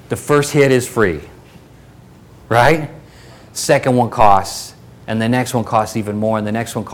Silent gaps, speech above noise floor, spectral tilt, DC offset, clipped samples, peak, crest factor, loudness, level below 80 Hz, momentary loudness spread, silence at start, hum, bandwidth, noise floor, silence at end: none; 27 dB; -5 dB/octave; under 0.1%; under 0.1%; 0 dBFS; 16 dB; -15 LUFS; -42 dBFS; 15 LU; 0.1 s; none; 19 kHz; -42 dBFS; 0 s